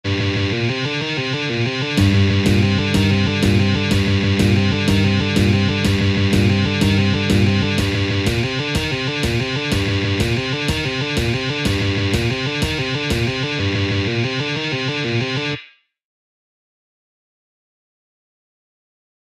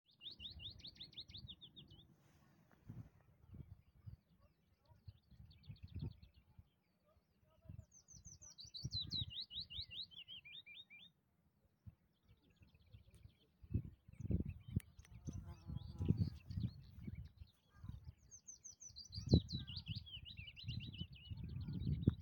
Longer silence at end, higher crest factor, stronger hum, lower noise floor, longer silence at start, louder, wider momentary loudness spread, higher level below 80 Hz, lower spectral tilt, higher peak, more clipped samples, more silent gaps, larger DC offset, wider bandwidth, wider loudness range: first, 3.75 s vs 0 s; second, 16 dB vs 32 dB; neither; second, -44 dBFS vs -80 dBFS; second, 0.05 s vs 0.2 s; first, -18 LUFS vs -47 LUFS; second, 5 LU vs 23 LU; first, -36 dBFS vs -60 dBFS; about the same, -5.5 dB/octave vs -5.5 dB/octave; first, -2 dBFS vs -16 dBFS; neither; neither; neither; second, 13.5 kHz vs 17 kHz; second, 7 LU vs 16 LU